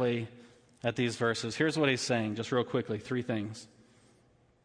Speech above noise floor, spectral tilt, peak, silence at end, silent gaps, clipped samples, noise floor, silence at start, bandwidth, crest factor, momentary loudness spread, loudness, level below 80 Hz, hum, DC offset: 34 dB; -5 dB/octave; -14 dBFS; 1 s; none; under 0.1%; -66 dBFS; 0 s; 10.5 kHz; 18 dB; 9 LU; -32 LUFS; -70 dBFS; none; under 0.1%